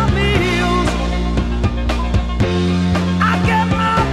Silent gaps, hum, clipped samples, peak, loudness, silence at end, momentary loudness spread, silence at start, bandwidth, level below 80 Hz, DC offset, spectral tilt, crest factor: none; none; under 0.1%; -2 dBFS; -16 LUFS; 0 s; 4 LU; 0 s; 12.5 kHz; -22 dBFS; under 0.1%; -6 dB/octave; 14 dB